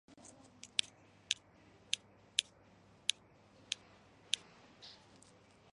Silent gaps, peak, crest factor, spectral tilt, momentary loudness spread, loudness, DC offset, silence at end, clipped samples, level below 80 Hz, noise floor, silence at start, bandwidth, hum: none; -8 dBFS; 38 dB; 1 dB/octave; 22 LU; -40 LUFS; under 0.1%; 0.8 s; under 0.1%; -80 dBFS; -64 dBFS; 0.65 s; 11.5 kHz; none